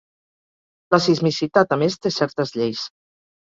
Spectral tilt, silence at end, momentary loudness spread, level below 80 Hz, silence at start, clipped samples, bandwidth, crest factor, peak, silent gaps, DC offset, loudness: -5.5 dB/octave; 0.55 s; 7 LU; -62 dBFS; 0.9 s; under 0.1%; 7.8 kHz; 20 dB; -2 dBFS; none; under 0.1%; -20 LUFS